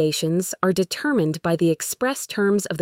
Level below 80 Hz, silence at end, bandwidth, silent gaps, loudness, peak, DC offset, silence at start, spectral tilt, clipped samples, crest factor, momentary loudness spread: -60 dBFS; 0 s; 16.5 kHz; none; -22 LUFS; -6 dBFS; under 0.1%; 0 s; -4.5 dB/octave; under 0.1%; 16 dB; 3 LU